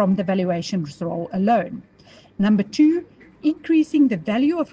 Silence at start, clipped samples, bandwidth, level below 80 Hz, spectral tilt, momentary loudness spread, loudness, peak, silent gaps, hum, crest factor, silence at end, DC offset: 0 s; under 0.1%; 7.8 kHz; -60 dBFS; -7.5 dB/octave; 9 LU; -21 LUFS; -8 dBFS; none; none; 14 dB; 0.05 s; under 0.1%